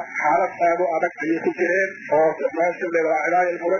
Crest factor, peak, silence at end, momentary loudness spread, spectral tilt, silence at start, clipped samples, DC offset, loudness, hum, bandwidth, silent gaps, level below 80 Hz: 12 dB; -8 dBFS; 0 s; 4 LU; -6 dB/octave; 0 s; under 0.1%; under 0.1%; -21 LUFS; none; 7 kHz; none; -66 dBFS